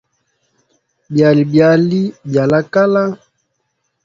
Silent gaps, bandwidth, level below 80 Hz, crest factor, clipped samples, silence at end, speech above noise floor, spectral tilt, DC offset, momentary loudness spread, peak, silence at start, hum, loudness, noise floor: none; 7.6 kHz; -56 dBFS; 14 dB; under 0.1%; 0.9 s; 56 dB; -8 dB/octave; under 0.1%; 9 LU; 0 dBFS; 1.1 s; none; -13 LUFS; -68 dBFS